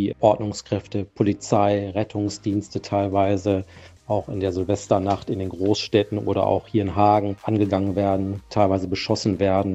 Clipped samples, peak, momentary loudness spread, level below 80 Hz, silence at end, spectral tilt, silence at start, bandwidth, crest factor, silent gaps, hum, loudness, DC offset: under 0.1%; -4 dBFS; 7 LU; -52 dBFS; 0 s; -6.5 dB/octave; 0 s; 8.2 kHz; 18 dB; none; none; -23 LUFS; under 0.1%